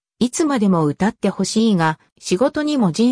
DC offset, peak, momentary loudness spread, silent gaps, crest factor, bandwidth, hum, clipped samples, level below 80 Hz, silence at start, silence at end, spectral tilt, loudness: under 0.1%; -6 dBFS; 5 LU; 2.12-2.16 s; 12 dB; 10.5 kHz; none; under 0.1%; -54 dBFS; 0.2 s; 0 s; -5.5 dB/octave; -18 LUFS